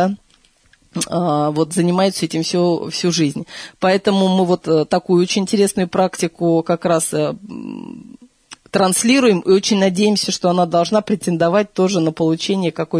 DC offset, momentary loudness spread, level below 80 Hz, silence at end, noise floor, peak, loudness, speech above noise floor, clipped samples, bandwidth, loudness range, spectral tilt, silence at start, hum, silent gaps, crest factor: under 0.1%; 9 LU; -58 dBFS; 0 s; -55 dBFS; -2 dBFS; -17 LUFS; 38 dB; under 0.1%; 11 kHz; 3 LU; -5 dB/octave; 0 s; none; none; 14 dB